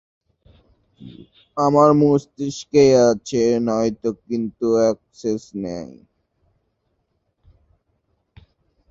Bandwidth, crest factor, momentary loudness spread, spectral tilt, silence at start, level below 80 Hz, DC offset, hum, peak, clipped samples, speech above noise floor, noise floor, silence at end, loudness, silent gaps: 7.8 kHz; 20 dB; 15 LU; -6.5 dB/octave; 1 s; -56 dBFS; under 0.1%; none; -2 dBFS; under 0.1%; 52 dB; -70 dBFS; 3.05 s; -19 LUFS; none